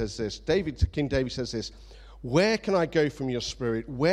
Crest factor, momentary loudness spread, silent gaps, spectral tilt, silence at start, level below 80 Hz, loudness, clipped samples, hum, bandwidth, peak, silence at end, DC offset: 18 dB; 9 LU; none; -5.5 dB/octave; 0 s; -40 dBFS; -27 LUFS; under 0.1%; none; 12 kHz; -10 dBFS; 0 s; under 0.1%